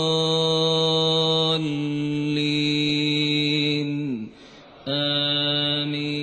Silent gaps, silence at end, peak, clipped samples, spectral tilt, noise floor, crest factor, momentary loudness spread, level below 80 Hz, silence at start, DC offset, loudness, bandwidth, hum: none; 0 s; -10 dBFS; under 0.1%; -5 dB/octave; -46 dBFS; 14 dB; 8 LU; -60 dBFS; 0 s; under 0.1%; -21 LUFS; 9 kHz; none